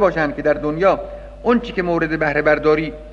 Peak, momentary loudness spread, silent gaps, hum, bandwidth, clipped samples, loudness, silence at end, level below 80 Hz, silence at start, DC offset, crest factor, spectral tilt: -2 dBFS; 6 LU; none; none; 7.2 kHz; under 0.1%; -18 LUFS; 0 s; -38 dBFS; 0 s; under 0.1%; 16 dB; -7.5 dB/octave